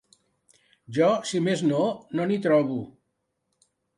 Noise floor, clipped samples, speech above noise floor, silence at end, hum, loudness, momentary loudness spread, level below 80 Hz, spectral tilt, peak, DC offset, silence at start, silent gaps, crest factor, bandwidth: -77 dBFS; under 0.1%; 53 dB; 1.1 s; none; -25 LUFS; 10 LU; -70 dBFS; -6 dB/octave; -8 dBFS; under 0.1%; 0.9 s; none; 18 dB; 11.5 kHz